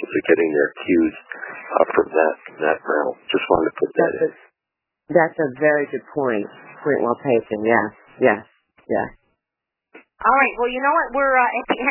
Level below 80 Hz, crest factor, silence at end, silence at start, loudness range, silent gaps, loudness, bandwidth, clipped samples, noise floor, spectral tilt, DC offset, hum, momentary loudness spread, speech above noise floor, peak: -56 dBFS; 20 dB; 0 s; 0 s; 2 LU; none; -20 LUFS; 3.1 kHz; under 0.1%; -84 dBFS; -9.5 dB/octave; under 0.1%; none; 9 LU; 65 dB; 0 dBFS